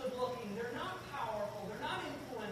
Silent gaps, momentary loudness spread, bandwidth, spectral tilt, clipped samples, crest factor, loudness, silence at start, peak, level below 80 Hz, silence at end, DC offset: none; 3 LU; 15.5 kHz; -5 dB/octave; under 0.1%; 16 dB; -41 LUFS; 0 s; -26 dBFS; -66 dBFS; 0 s; under 0.1%